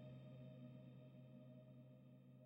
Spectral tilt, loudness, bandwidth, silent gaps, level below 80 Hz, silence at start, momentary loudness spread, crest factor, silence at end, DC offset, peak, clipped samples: -9 dB/octave; -62 LUFS; 16 kHz; none; -88 dBFS; 0 s; 6 LU; 12 dB; 0 s; under 0.1%; -50 dBFS; under 0.1%